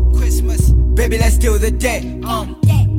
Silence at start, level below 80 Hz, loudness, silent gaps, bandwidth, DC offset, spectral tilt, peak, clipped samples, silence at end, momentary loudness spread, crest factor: 0 s; -14 dBFS; -16 LUFS; none; 16 kHz; under 0.1%; -6 dB/octave; -2 dBFS; under 0.1%; 0 s; 8 LU; 10 dB